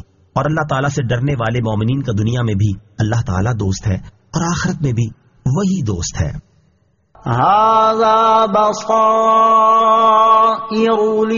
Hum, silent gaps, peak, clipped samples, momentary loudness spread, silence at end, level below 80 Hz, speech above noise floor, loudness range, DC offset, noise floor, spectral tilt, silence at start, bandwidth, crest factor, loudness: none; none; -2 dBFS; under 0.1%; 11 LU; 0 s; -38 dBFS; 44 dB; 8 LU; under 0.1%; -58 dBFS; -6 dB/octave; 0.35 s; 7.4 kHz; 12 dB; -15 LUFS